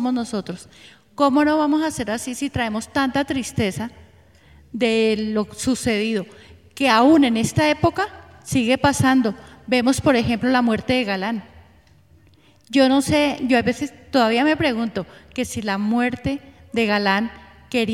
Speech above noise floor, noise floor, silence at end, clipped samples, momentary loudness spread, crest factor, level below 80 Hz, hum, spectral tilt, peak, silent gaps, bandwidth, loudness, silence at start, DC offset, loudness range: 34 dB; -54 dBFS; 0 s; under 0.1%; 12 LU; 20 dB; -48 dBFS; none; -5 dB/octave; -2 dBFS; none; 15.5 kHz; -20 LUFS; 0 s; under 0.1%; 5 LU